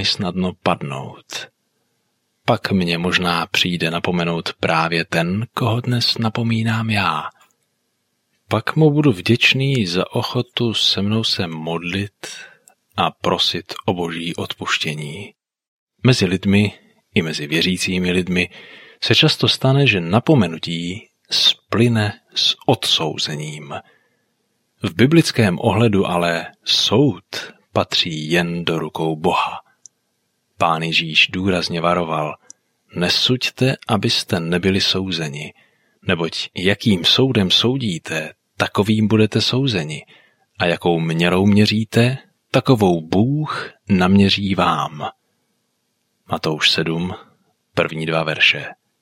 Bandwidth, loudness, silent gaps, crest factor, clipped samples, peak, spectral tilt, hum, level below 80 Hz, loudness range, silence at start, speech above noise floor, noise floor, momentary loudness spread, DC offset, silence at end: 16 kHz; -18 LUFS; 15.68-15.87 s; 18 dB; under 0.1%; -2 dBFS; -5 dB/octave; none; -56 dBFS; 4 LU; 0 s; 52 dB; -70 dBFS; 14 LU; under 0.1%; 0.3 s